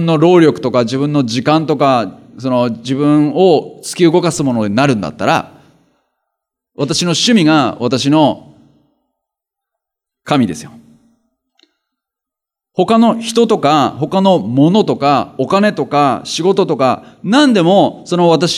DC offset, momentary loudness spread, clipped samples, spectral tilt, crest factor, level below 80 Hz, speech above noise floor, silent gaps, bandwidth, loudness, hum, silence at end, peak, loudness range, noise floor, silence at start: under 0.1%; 7 LU; under 0.1%; -5.5 dB/octave; 14 dB; -58 dBFS; 72 dB; none; 14 kHz; -12 LUFS; none; 0 s; 0 dBFS; 10 LU; -84 dBFS; 0 s